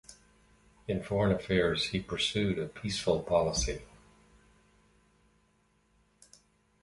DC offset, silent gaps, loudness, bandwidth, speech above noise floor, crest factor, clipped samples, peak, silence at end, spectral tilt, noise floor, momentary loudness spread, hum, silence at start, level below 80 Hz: under 0.1%; none; -31 LUFS; 11.5 kHz; 40 dB; 20 dB; under 0.1%; -14 dBFS; 3 s; -4.5 dB/octave; -70 dBFS; 9 LU; none; 0.1 s; -50 dBFS